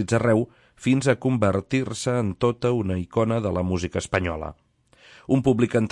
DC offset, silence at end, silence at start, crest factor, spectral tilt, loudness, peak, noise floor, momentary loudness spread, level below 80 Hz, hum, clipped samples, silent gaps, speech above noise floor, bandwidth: under 0.1%; 0 s; 0 s; 18 dB; -6.5 dB/octave; -24 LUFS; -4 dBFS; -55 dBFS; 8 LU; -52 dBFS; none; under 0.1%; none; 33 dB; 11.5 kHz